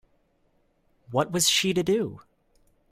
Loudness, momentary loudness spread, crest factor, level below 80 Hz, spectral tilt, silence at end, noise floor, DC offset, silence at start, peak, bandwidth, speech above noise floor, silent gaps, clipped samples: -24 LUFS; 9 LU; 20 dB; -60 dBFS; -3 dB/octave; 0.75 s; -68 dBFS; under 0.1%; 1.1 s; -10 dBFS; 16 kHz; 43 dB; none; under 0.1%